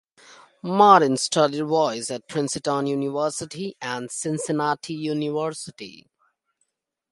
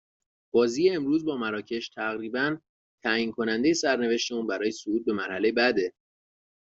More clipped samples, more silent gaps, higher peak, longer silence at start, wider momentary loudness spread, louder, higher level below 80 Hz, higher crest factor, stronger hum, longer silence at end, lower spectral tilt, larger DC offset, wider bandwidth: neither; second, none vs 2.69-2.98 s; first, 0 dBFS vs -8 dBFS; second, 0.3 s vs 0.55 s; first, 16 LU vs 8 LU; first, -22 LUFS vs -27 LUFS; about the same, -70 dBFS vs -68 dBFS; first, 24 dB vs 18 dB; neither; first, 1.1 s vs 0.85 s; about the same, -4.5 dB/octave vs -4 dB/octave; neither; first, 11.5 kHz vs 8 kHz